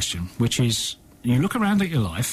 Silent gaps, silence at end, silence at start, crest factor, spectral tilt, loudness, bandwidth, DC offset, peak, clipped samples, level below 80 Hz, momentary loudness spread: none; 0 s; 0 s; 12 dB; -4.5 dB/octave; -23 LUFS; 15.5 kHz; under 0.1%; -12 dBFS; under 0.1%; -46 dBFS; 6 LU